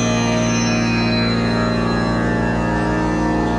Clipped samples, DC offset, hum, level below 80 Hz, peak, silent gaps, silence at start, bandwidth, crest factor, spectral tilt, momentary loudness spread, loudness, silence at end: under 0.1%; under 0.1%; none; -30 dBFS; -6 dBFS; none; 0 s; 10.5 kHz; 12 dB; -5.5 dB/octave; 2 LU; -18 LUFS; 0 s